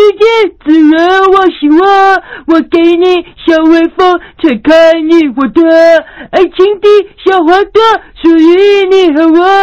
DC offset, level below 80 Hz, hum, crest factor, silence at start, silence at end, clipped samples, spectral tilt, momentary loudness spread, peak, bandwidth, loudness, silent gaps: 0.5%; -40 dBFS; none; 6 dB; 0 s; 0 s; 1%; -4.5 dB/octave; 6 LU; 0 dBFS; 7.2 kHz; -6 LUFS; none